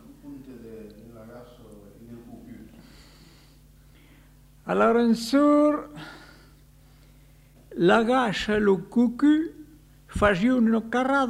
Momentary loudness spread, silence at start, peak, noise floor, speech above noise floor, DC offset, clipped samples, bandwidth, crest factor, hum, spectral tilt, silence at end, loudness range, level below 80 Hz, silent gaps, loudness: 25 LU; 0.25 s; -6 dBFS; -53 dBFS; 32 dB; under 0.1%; under 0.1%; 15 kHz; 20 dB; none; -6 dB/octave; 0 s; 7 LU; -50 dBFS; none; -22 LUFS